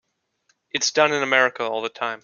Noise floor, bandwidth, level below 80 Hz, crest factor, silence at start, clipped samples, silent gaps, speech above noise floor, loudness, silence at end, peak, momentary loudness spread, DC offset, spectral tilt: -68 dBFS; 7.4 kHz; -72 dBFS; 22 dB; 0.75 s; under 0.1%; none; 47 dB; -21 LUFS; 0.05 s; -2 dBFS; 9 LU; under 0.1%; -1.5 dB/octave